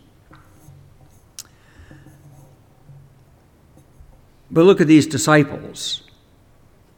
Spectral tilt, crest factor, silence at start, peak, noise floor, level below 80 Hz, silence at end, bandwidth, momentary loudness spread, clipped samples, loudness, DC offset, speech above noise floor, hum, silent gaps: -5.5 dB/octave; 20 dB; 1.4 s; -2 dBFS; -52 dBFS; -54 dBFS; 1 s; 16.5 kHz; 26 LU; under 0.1%; -16 LUFS; under 0.1%; 37 dB; none; none